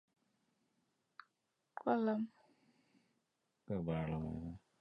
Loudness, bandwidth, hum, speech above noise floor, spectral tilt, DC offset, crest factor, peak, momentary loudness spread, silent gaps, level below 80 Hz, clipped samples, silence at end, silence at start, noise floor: -41 LUFS; 5.8 kHz; none; 47 dB; -9.5 dB/octave; under 0.1%; 22 dB; -22 dBFS; 12 LU; none; -64 dBFS; under 0.1%; 0.25 s; 1.75 s; -85 dBFS